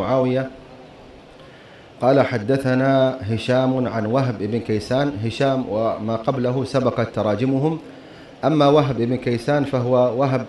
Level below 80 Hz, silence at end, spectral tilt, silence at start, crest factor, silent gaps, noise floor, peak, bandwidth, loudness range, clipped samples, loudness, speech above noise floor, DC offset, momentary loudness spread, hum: -52 dBFS; 0 s; -7.5 dB/octave; 0 s; 16 dB; none; -44 dBFS; -4 dBFS; 11.5 kHz; 2 LU; under 0.1%; -20 LUFS; 24 dB; under 0.1%; 7 LU; none